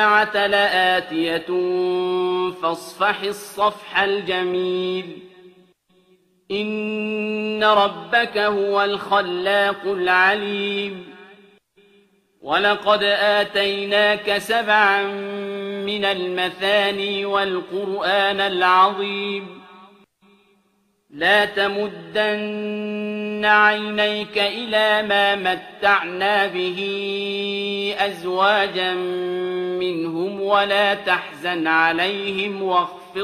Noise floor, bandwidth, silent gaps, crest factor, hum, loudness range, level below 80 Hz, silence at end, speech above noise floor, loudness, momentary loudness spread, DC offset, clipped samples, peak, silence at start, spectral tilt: -65 dBFS; 14 kHz; none; 18 dB; none; 4 LU; -64 dBFS; 0 s; 44 dB; -20 LUFS; 9 LU; under 0.1%; under 0.1%; -2 dBFS; 0 s; -4 dB/octave